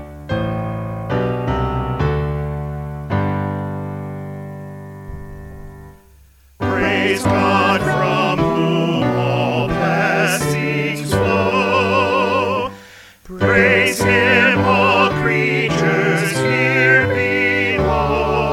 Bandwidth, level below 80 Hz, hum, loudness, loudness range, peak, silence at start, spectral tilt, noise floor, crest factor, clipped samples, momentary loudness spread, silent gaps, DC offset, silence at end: 16.5 kHz; -36 dBFS; none; -16 LUFS; 11 LU; 0 dBFS; 0 s; -5.5 dB/octave; -48 dBFS; 18 dB; under 0.1%; 15 LU; none; under 0.1%; 0 s